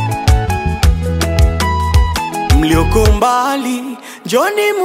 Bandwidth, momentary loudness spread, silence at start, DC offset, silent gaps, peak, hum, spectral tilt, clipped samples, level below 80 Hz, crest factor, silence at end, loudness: 16.5 kHz; 7 LU; 0 s; under 0.1%; none; 0 dBFS; none; -5.5 dB/octave; under 0.1%; -16 dBFS; 12 dB; 0 s; -14 LUFS